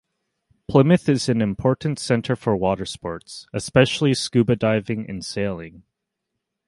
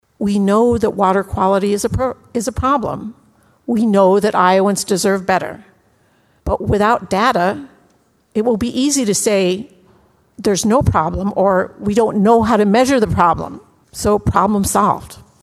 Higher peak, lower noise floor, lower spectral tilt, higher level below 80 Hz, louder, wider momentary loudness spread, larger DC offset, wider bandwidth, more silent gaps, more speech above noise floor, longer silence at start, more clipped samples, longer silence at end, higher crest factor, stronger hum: about the same, 0 dBFS vs 0 dBFS; first, -80 dBFS vs -56 dBFS; about the same, -6 dB/octave vs -5 dB/octave; second, -50 dBFS vs -36 dBFS; second, -21 LUFS vs -15 LUFS; first, 14 LU vs 10 LU; neither; second, 11.5 kHz vs 14.5 kHz; neither; first, 60 dB vs 42 dB; first, 0.7 s vs 0.2 s; neither; first, 0.9 s vs 0.2 s; about the same, 20 dB vs 16 dB; neither